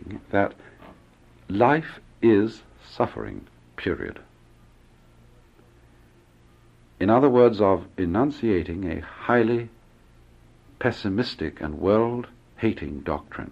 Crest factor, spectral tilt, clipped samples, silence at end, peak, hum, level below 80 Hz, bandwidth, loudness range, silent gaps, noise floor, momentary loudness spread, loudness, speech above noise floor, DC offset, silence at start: 22 dB; -8 dB/octave; under 0.1%; 0 s; -4 dBFS; none; -50 dBFS; 8 kHz; 13 LU; none; -55 dBFS; 15 LU; -24 LUFS; 32 dB; under 0.1%; 0.05 s